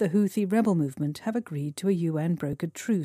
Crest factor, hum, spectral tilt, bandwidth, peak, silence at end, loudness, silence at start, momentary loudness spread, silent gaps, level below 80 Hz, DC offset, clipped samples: 14 dB; none; -7.5 dB/octave; 15.5 kHz; -14 dBFS; 0 s; -28 LUFS; 0 s; 7 LU; none; -66 dBFS; under 0.1%; under 0.1%